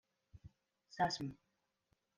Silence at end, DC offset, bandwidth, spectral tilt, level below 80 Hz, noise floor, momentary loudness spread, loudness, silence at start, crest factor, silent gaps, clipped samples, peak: 0.85 s; under 0.1%; 11 kHz; -4.5 dB/octave; -72 dBFS; -83 dBFS; 24 LU; -40 LUFS; 0.35 s; 22 dB; none; under 0.1%; -24 dBFS